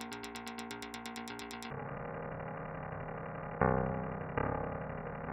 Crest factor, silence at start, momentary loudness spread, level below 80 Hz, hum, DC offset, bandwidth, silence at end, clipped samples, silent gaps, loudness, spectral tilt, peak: 28 dB; 0 s; 10 LU; -54 dBFS; none; under 0.1%; 16.5 kHz; 0 s; under 0.1%; none; -39 LUFS; -6 dB/octave; -12 dBFS